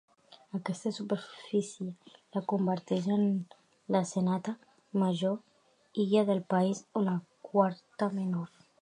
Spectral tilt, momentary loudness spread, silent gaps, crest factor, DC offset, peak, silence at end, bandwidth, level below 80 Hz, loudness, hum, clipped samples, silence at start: -7 dB/octave; 12 LU; none; 20 dB; under 0.1%; -12 dBFS; 0.35 s; 10.5 kHz; -82 dBFS; -32 LUFS; none; under 0.1%; 0.55 s